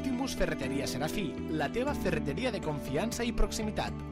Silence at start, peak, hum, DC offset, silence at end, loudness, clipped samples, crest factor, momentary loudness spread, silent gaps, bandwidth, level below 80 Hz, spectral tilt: 0 s; -16 dBFS; none; under 0.1%; 0 s; -33 LUFS; under 0.1%; 16 dB; 3 LU; none; 16 kHz; -40 dBFS; -5 dB/octave